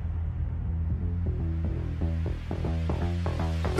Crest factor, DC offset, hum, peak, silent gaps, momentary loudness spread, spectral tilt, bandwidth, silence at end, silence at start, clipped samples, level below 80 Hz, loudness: 16 dB; under 0.1%; none; -12 dBFS; none; 3 LU; -8 dB/octave; 7.2 kHz; 0 s; 0 s; under 0.1%; -32 dBFS; -31 LUFS